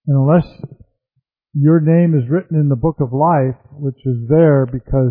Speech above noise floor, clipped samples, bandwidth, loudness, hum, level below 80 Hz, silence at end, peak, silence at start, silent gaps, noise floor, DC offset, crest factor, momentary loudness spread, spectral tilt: 56 dB; under 0.1%; 4.3 kHz; -15 LUFS; none; -38 dBFS; 0 s; 0 dBFS; 0.05 s; none; -70 dBFS; under 0.1%; 14 dB; 13 LU; -14 dB/octave